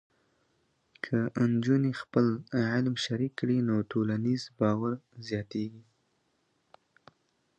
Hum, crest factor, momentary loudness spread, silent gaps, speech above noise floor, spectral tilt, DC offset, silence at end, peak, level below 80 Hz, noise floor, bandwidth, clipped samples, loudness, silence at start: none; 20 dB; 9 LU; none; 45 dB; -7 dB/octave; under 0.1%; 1.8 s; -12 dBFS; -66 dBFS; -74 dBFS; 9 kHz; under 0.1%; -30 LUFS; 1.05 s